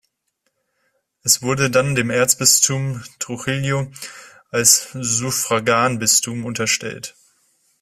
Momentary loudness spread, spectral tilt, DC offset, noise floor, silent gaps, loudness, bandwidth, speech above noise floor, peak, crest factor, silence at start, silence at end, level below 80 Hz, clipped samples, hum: 16 LU; -2.5 dB/octave; under 0.1%; -72 dBFS; none; -17 LUFS; 16 kHz; 53 dB; 0 dBFS; 20 dB; 1.25 s; 0.7 s; -56 dBFS; under 0.1%; none